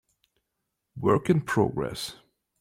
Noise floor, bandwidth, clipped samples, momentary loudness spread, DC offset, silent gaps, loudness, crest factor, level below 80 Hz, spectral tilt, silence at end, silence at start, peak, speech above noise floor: -82 dBFS; 16 kHz; under 0.1%; 11 LU; under 0.1%; none; -26 LUFS; 20 dB; -58 dBFS; -6.5 dB/octave; 0.45 s; 0.95 s; -10 dBFS; 57 dB